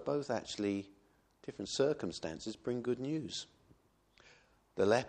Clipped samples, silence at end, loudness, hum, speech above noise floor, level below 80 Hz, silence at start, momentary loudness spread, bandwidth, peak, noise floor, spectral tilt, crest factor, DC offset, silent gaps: under 0.1%; 0 s; -38 LUFS; none; 34 dB; -70 dBFS; 0 s; 16 LU; 10 kHz; -18 dBFS; -70 dBFS; -5 dB/octave; 20 dB; under 0.1%; none